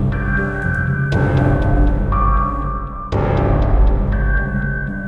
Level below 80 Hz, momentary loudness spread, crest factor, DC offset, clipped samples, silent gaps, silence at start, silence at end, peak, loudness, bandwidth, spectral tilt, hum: -18 dBFS; 6 LU; 12 dB; under 0.1%; under 0.1%; none; 0 s; 0 s; -2 dBFS; -18 LUFS; 5.2 kHz; -9 dB/octave; none